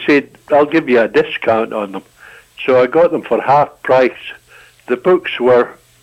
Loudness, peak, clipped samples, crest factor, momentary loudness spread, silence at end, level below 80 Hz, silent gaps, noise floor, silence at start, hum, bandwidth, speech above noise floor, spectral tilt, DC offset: -14 LUFS; -2 dBFS; under 0.1%; 12 dB; 10 LU; 0.3 s; -54 dBFS; none; -42 dBFS; 0 s; none; 10.5 kHz; 29 dB; -6.5 dB/octave; under 0.1%